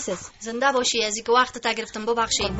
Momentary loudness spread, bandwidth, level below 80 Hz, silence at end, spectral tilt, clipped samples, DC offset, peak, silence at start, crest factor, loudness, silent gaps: 10 LU; 8.2 kHz; -50 dBFS; 0 s; -2 dB/octave; under 0.1%; under 0.1%; -8 dBFS; 0 s; 16 dB; -23 LUFS; none